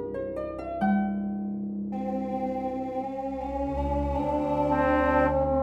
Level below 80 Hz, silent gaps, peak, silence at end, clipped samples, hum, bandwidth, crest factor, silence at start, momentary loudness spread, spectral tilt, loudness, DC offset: -40 dBFS; none; -10 dBFS; 0 s; under 0.1%; none; 8 kHz; 18 dB; 0 s; 10 LU; -9 dB/octave; -28 LUFS; under 0.1%